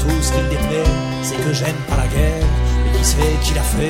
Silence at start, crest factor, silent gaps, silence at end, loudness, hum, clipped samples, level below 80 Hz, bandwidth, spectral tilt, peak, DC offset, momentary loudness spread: 0 s; 14 dB; none; 0 s; -18 LUFS; none; under 0.1%; -18 dBFS; 16.5 kHz; -5 dB/octave; -2 dBFS; under 0.1%; 4 LU